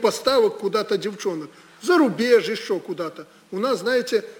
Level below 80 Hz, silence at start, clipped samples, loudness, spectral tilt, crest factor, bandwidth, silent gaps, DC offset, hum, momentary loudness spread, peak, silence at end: -66 dBFS; 0 s; under 0.1%; -22 LUFS; -4 dB/octave; 16 dB; 19 kHz; none; under 0.1%; none; 13 LU; -4 dBFS; 0.05 s